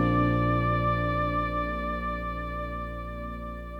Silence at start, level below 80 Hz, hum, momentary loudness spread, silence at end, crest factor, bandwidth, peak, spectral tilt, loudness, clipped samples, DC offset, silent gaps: 0 s; -36 dBFS; 60 Hz at -80 dBFS; 12 LU; 0 s; 16 dB; 5.6 kHz; -12 dBFS; -9 dB/octave; -29 LUFS; under 0.1%; under 0.1%; none